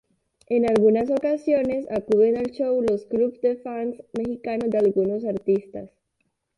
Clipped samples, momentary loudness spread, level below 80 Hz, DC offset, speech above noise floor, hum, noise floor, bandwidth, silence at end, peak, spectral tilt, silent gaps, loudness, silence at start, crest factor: under 0.1%; 10 LU; -58 dBFS; under 0.1%; 52 dB; none; -74 dBFS; 11 kHz; 0.7 s; -8 dBFS; -8 dB/octave; none; -23 LUFS; 0.5 s; 14 dB